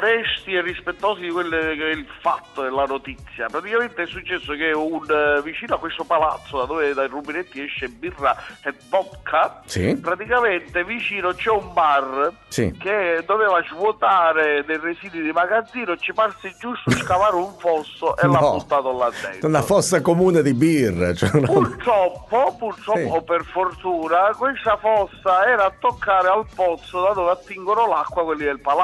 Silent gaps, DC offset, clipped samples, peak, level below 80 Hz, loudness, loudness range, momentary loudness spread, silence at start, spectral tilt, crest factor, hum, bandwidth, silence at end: none; under 0.1%; under 0.1%; -2 dBFS; -48 dBFS; -20 LUFS; 5 LU; 9 LU; 0 s; -5 dB/octave; 18 dB; none; 12 kHz; 0 s